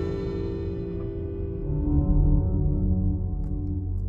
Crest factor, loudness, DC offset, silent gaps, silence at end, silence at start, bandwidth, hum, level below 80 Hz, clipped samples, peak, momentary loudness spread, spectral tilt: 14 dB; -27 LUFS; under 0.1%; none; 0 s; 0 s; 4.3 kHz; none; -28 dBFS; under 0.1%; -10 dBFS; 9 LU; -11.5 dB/octave